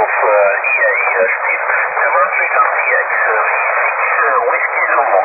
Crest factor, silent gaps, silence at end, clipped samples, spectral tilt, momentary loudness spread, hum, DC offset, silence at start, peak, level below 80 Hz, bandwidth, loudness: 12 dB; none; 0 s; under 0.1%; -8 dB/octave; 2 LU; none; under 0.1%; 0 s; 0 dBFS; -74 dBFS; 2.8 kHz; -12 LUFS